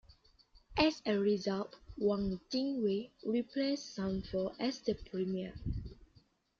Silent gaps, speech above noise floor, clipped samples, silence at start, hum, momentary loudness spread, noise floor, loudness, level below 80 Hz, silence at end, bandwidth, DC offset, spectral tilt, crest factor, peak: none; 33 dB; under 0.1%; 0.1 s; none; 9 LU; -68 dBFS; -36 LUFS; -54 dBFS; 0.65 s; 7.4 kHz; under 0.1%; -6 dB/octave; 22 dB; -14 dBFS